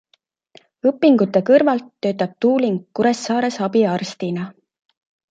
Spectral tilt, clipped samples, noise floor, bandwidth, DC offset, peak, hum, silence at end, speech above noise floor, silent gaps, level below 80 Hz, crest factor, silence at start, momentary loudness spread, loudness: -6 dB/octave; under 0.1%; -64 dBFS; 9.2 kHz; under 0.1%; -2 dBFS; none; 0.8 s; 46 dB; none; -66 dBFS; 18 dB; 0.85 s; 10 LU; -18 LUFS